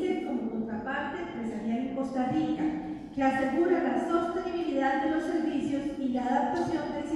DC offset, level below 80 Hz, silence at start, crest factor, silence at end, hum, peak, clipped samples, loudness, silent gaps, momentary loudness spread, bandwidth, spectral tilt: under 0.1%; -58 dBFS; 0 s; 14 dB; 0 s; none; -14 dBFS; under 0.1%; -30 LUFS; none; 7 LU; 11 kHz; -6.5 dB/octave